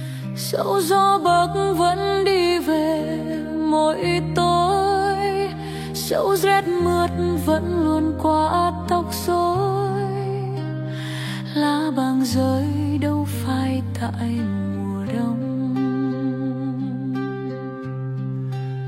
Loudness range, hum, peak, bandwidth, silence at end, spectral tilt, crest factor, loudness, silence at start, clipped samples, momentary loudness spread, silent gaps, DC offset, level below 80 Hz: 5 LU; none; -6 dBFS; 16.5 kHz; 0 s; -6 dB/octave; 14 dB; -21 LUFS; 0 s; under 0.1%; 9 LU; none; under 0.1%; -46 dBFS